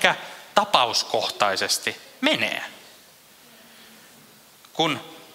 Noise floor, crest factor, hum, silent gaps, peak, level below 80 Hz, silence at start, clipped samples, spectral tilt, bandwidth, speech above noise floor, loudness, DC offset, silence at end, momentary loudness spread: -51 dBFS; 26 dB; none; none; 0 dBFS; -70 dBFS; 0 s; under 0.1%; -2 dB/octave; 16 kHz; 28 dB; -23 LUFS; under 0.1%; 0.1 s; 12 LU